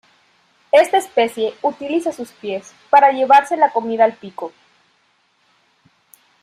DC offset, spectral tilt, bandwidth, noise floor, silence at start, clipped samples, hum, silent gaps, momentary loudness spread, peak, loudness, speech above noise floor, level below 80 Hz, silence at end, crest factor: under 0.1%; -3.5 dB/octave; 14.5 kHz; -61 dBFS; 0.75 s; under 0.1%; none; none; 17 LU; -2 dBFS; -16 LUFS; 45 dB; -70 dBFS; 1.95 s; 16 dB